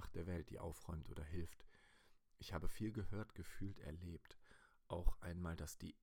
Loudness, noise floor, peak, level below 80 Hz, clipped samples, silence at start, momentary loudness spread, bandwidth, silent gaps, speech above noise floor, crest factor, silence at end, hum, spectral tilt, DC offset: -51 LUFS; -71 dBFS; -24 dBFS; -52 dBFS; under 0.1%; 0 s; 12 LU; 17.5 kHz; none; 25 dB; 24 dB; 0.1 s; none; -6 dB/octave; under 0.1%